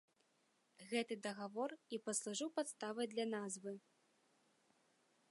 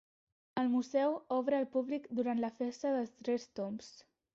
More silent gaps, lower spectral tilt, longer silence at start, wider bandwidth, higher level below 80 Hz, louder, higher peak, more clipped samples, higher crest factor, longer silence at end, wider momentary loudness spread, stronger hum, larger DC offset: neither; second, -3 dB/octave vs -5 dB/octave; first, 0.8 s vs 0.55 s; first, 11.5 kHz vs 7.6 kHz; second, under -90 dBFS vs -80 dBFS; second, -44 LUFS vs -36 LUFS; second, -26 dBFS vs -20 dBFS; neither; about the same, 20 dB vs 16 dB; first, 1.5 s vs 0.35 s; about the same, 7 LU vs 9 LU; neither; neither